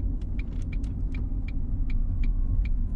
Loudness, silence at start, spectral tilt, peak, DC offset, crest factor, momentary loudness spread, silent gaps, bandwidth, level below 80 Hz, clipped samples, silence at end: -32 LUFS; 0 s; -9 dB/octave; -14 dBFS; under 0.1%; 12 dB; 4 LU; none; 4.2 kHz; -26 dBFS; under 0.1%; 0 s